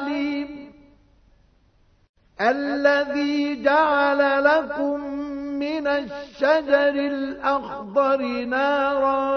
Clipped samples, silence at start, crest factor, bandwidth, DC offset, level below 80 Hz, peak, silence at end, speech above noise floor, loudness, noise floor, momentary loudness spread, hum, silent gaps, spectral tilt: under 0.1%; 0 s; 18 dB; 6.4 kHz; under 0.1%; -58 dBFS; -4 dBFS; 0 s; 38 dB; -22 LUFS; -59 dBFS; 10 LU; none; 2.09-2.14 s; -5 dB/octave